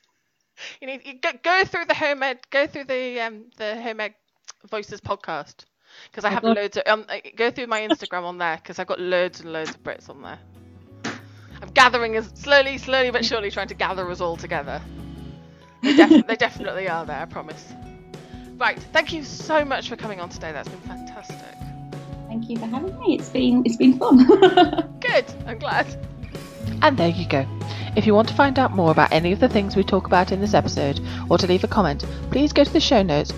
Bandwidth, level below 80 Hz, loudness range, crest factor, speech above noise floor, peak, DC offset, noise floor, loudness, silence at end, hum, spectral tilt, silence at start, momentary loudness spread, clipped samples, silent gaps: 11.5 kHz; -42 dBFS; 11 LU; 22 dB; 51 dB; 0 dBFS; under 0.1%; -72 dBFS; -20 LUFS; 0 s; none; -5.5 dB/octave; 0.6 s; 20 LU; under 0.1%; none